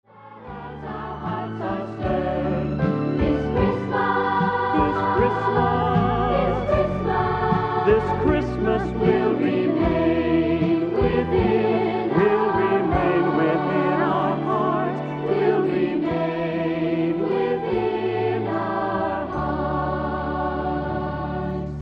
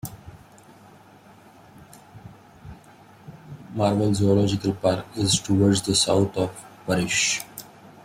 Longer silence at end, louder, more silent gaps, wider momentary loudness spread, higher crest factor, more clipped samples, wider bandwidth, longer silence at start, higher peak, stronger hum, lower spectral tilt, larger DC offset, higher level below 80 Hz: second, 0 s vs 0.4 s; about the same, -22 LUFS vs -22 LUFS; neither; second, 7 LU vs 18 LU; about the same, 16 dB vs 18 dB; neither; second, 6.8 kHz vs 16 kHz; about the same, 0.15 s vs 0.05 s; first, -4 dBFS vs -8 dBFS; neither; first, -9 dB/octave vs -4.5 dB/octave; neither; first, -38 dBFS vs -54 dBFS